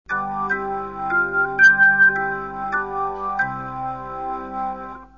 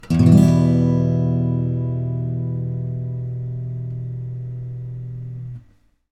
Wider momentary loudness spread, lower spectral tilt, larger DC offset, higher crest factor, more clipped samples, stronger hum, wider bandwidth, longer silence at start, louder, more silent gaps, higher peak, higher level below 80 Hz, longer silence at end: about the same, 16 LU vs 18 LU; second, -5 dB/octave vs -9.5 dB/octave; first, 0.2% vs under 0.1%; about the same, 16 dB vs 20 dB; neither; first, 50 Hz at -50 dBFS vs none; second, 7 kHz vs 11 kHz; about the same, 0.1 s vs 0.05 s; about the same, -19 LUFS vs -20 LUFS; neither; second, -4 dBFS vs 0 dBFS; about the same, -48 dBFS vs -44 dBFS; second, 0.1 s vs 0.5 s